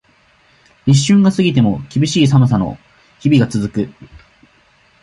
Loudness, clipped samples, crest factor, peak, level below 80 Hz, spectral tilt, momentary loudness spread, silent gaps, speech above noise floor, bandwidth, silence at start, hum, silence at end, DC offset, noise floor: -14 LUFS; under 0.1%; 14 dB; -2 dBFS; -44 dBFS; -6.5 dB/octave; 12 LU; none; 40 dB; 11.5 kHz; 0.85 s; none; 1.1 s; under 0.1%; -53 dBFS